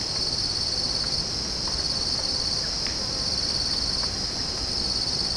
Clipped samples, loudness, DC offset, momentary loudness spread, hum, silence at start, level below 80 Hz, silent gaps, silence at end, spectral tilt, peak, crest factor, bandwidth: under 0.1%; -24 LUFS; under 0.1%; 2 LU; none; 0 s; -40 dBFS; none; 0 s; -2 dB/octave; -14 dBFS; 14 dB; 10.5 kHz